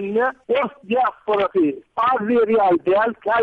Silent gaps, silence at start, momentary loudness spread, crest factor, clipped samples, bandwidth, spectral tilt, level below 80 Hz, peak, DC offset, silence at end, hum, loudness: none; 0 s; 5 LU; 10 dB; under 0.1%; 4.9 kHz; -7.5 dB/octave; -60 dBFS; -10 dBFS; under 0.1%; 0 s; none; -19 LUFS